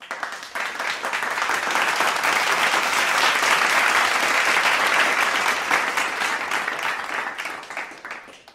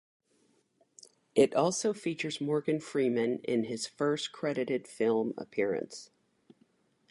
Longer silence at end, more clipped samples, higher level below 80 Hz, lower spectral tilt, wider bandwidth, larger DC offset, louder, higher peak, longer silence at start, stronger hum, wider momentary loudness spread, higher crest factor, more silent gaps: second, 0.15 s vs 1.05 s; neither; first, -64 dBFS vs -78 dBFS; second, 0 dB/octave vs -4.5 dB/octave; first, 16 kHz vs 11.5 kHz; neither; first, -20 LUFS vs -31 LUFS; first, -4 dBFS vs -12 dBFS; second, 0 s vs 1.35 s; neither; first, 13 LU vs 8 LU; about the same, 18 dB vs 22 dB; neither